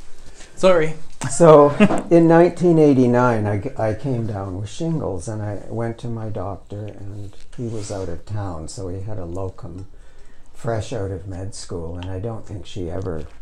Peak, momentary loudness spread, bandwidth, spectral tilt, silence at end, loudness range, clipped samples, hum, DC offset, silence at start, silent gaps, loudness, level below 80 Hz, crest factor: 0 dBFS; 19 LU; 11.5 kHz; -7 dB/octave; 0 s; 16 LU; under 0.1%; none; under 0.1%; 0 s; none; -19 LUFS; -40 dBFS; 20 dB